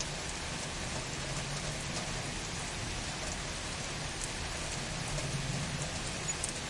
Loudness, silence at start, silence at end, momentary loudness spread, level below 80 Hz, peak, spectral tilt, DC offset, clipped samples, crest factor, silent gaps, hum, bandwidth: -36 LUFS; 0 s; 0 s; 2 LU; -48 dBFS; -16 dBFS; -3 dB/octave; under 0.1%; under 0.1%; 20 dB; none; none; 11.5 kHz